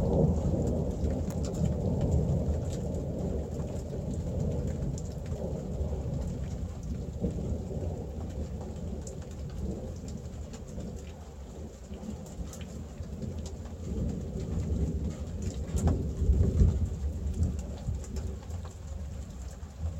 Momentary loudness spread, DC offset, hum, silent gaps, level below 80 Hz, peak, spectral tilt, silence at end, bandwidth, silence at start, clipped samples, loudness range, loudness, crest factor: 13 LU; under 0.1%; none; none; -38 dBFS; -10 dBFS; -8 dB/octave; 0 s; 12 kHz; 0 s; under 0.1%; 10 LU; -34 LUFS; 22 dB